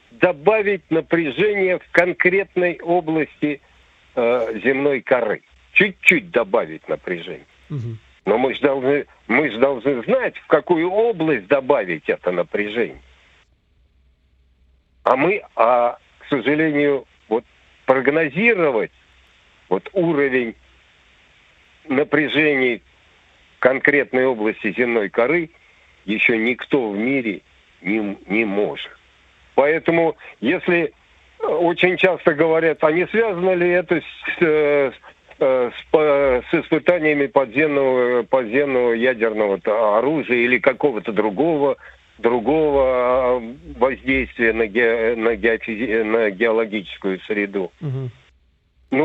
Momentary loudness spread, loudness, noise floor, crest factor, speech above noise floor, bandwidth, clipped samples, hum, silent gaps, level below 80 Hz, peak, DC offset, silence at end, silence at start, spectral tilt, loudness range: 9 LU; -19 LUFS; -59 dBFS; 20 dB; 41 dB; 8 kHz; under 0.1%; none; none; -52 dBFS; 0 dBFS; under 0.1%; 0 s; 0.2 s; -7 dB/octave; 4 LU